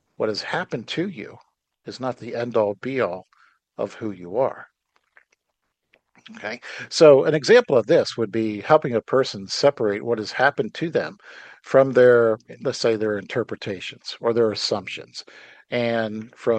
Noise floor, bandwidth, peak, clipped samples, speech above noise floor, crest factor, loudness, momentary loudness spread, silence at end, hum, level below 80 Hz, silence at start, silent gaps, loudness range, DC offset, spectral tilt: -77 dBFS; 9 kHz; -2 dBFS; under 0.1%; 56 dB; 20 dB; -21 LUFS; 17 LU; 0 s; none; -70 dBFS; 0.2 s; none; 11 LU; under 0.1%; -5 dB/octave